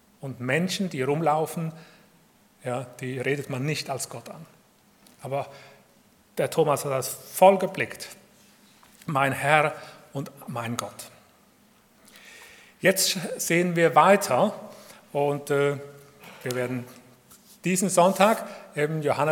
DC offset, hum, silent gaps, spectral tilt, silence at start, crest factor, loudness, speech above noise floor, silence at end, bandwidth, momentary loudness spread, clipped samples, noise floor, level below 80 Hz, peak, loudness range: under 0.1%; none; none; -4.5 dB/octave; 0.25 s; 24 dB; -25 LUFS; 35 dB; 0 s; 18 kHz; 22 LU; under 0.1%; -59 dBFS; -74 dBFS; -2 dBFS; 9 LU